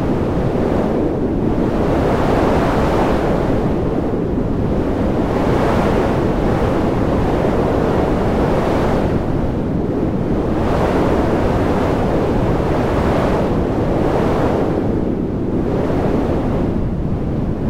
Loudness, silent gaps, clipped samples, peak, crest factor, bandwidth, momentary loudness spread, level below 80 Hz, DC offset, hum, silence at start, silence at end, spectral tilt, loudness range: -17 LUFS; none; under 0.1%; -2 dBFS; 14 dB; 16 kHz; 4 LU; -26 dBFS; under 0.1%; none; 0 s; 0 s; -8 dB/octave; 1 LU